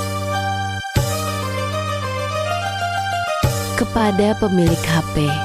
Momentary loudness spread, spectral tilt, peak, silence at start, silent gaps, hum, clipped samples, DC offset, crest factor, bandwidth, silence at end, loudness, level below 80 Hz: 6 LU; -5 dB/octave; -4 dBFS; 0 s; none; none; under 0.1%; under 0.1%; 14 dB; 16 kHz; 0 s; -20 LUFS; -36 dBFS